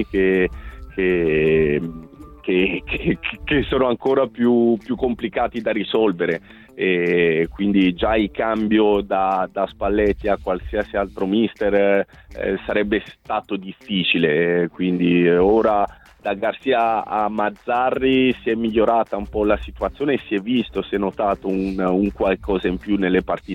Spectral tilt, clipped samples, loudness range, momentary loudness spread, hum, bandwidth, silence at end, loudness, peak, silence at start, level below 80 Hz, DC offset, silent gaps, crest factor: -8 dB/octave; under 0.1%; 3 LU; 8 LU; none; 7 kHz; 0 s; -20 LUFS; -4 dBFS; 0 s; -40 dBFS; under 0.1%; none; 16 dB